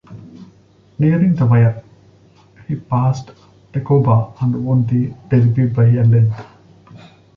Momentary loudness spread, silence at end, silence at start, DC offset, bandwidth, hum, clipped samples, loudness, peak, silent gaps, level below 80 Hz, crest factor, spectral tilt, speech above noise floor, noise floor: 14 LU; 0.4 s; 0.1 s; under 0.1%; 6.2 kHz; none; under 0.1%; -16 LUFS; -2 dBFS; none; -48 dBFS; 14 dB; -10.5 dB/octave; 35 dB; -49 dBFS